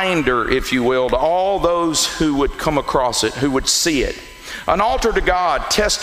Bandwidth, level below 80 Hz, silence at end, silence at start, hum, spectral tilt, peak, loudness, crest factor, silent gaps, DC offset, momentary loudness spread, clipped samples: 16 kHz; -32 dBFS; 0 s; 0 s; none; -3 dB/octave; 0 dBFS; -17 LUFS; 16 dB; none; under 0.1%; 4 LU; under 0.1%